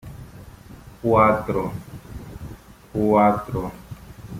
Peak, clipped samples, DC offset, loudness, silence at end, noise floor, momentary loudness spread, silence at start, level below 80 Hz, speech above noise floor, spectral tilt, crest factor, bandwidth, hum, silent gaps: -4 dBFS; under 0.1%; under 0.1%; -21 LUFS; 0 s; -43 dBFS; 23 LU; 0.05 s; -44 dBFS; 24 dB; -8 dB/octave; 20 dB; 16 kHz; none; none